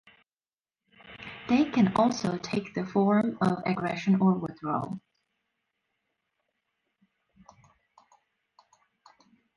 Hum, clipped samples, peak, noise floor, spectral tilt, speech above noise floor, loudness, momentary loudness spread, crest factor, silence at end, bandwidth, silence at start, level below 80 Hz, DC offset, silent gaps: none; under 0.1%; -10 dBFS; under -90 dBFS; -7 dB/octave; over 64 dB; -27 LUFS; 15 LU; 20 dB; 4.6 s; 10.5 kHz; 1.05 s; -66 dBFS; under 0.1%; none